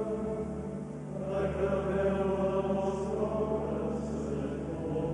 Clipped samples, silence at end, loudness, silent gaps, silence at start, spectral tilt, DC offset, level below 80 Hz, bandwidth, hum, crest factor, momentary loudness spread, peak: under 0.1%; 0 s; -33 LUFS; none; 0 s; -8 dB/octave; under 0.1%; -48 dBFS; 11 kHz; 50 Hz at -50 dBFS; 14 dB; 8 LU; -18 dBFS